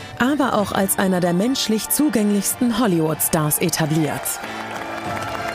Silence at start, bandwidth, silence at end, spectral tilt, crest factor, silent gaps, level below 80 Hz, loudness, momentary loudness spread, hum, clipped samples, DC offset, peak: 0 s; 16 kHz; 0 s; -4.5 dB/octave; 16 dB; none; -50 dBFS; -20 LUFS; 9 LU; none; under 0.1%; under 0.1%; -4 dBFS